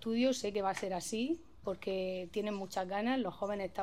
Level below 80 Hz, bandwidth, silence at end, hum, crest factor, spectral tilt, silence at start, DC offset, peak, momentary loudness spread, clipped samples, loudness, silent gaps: -66 dBFS; 15 kHz; 0 s; none; 16 dB; -4.5 dB/octave; 0 s; 0.1%; -20 dBFS; 6 LU; under 0.1%; -37 LUFS; none